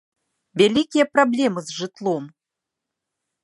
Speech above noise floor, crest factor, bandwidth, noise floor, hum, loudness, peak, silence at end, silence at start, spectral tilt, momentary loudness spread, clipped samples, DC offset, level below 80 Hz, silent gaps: 65 dB; 20 dB; 11.5 kHz; -85 dBFS; none; -20 LUFS; -2 dBFS; 1.15 s; 0.55 s; -4.5 dB/octave; 11 LU; under 0.1%; under 0.1%; -66 dBFS; none